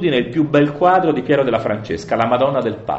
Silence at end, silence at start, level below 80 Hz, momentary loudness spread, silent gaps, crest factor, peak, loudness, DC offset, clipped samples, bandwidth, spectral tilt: 0 s; 0 s; -50 dBFS; 7 LU; none; 14 dB; -2 dBFS; -17 LUFS; under 0.1%; under 0.1%; 8 kHz; -7 dB/octave